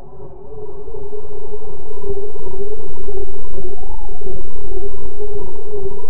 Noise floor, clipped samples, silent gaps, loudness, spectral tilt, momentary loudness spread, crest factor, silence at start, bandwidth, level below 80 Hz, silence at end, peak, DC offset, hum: -33 dBFS; under 0.1%; none; -31 LUFS; -13.5 dB/octave; 5 LU; 8 dB; 0 s; 2 kHz; -32 dBFS; 0.05 s; 0 dBFS; 60%; none